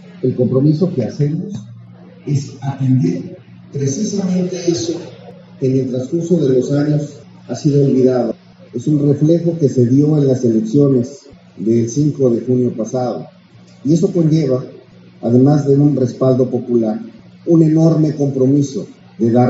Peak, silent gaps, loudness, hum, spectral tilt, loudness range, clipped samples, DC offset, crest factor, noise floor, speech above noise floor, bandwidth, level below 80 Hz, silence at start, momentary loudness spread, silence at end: 0 dBFS; none; -15 LUFS; none; -9.5 dB/octave; 5 LU; under 0.1%; under 0.1%; 14 dB; -38 dBFS; 24 dB; 8 kHz; -58 dBFS; 0.1 s; 14 LU; 0 s